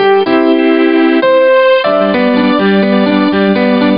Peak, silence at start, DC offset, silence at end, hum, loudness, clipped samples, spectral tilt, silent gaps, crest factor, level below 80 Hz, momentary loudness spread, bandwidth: 0 dBFS; 0 s; 0.6%; 0 s; none; -9 LUFS; under 0.1%; -11 dB/octave; none; 8 dB; -50 dBFS; 3 LU; 5.4 kHz